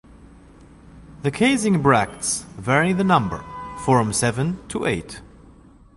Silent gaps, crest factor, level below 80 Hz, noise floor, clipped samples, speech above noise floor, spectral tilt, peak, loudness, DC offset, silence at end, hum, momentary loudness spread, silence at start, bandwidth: none; 20 dB; -46 dBFS; -48 dBFS; under 0.1%; 28 dB; -5 dB/octave; -2 dBFS; -21 LUFS; under 0.1%; 0.75 s; none; 11 LU; 0.95 s; 11.5 kHz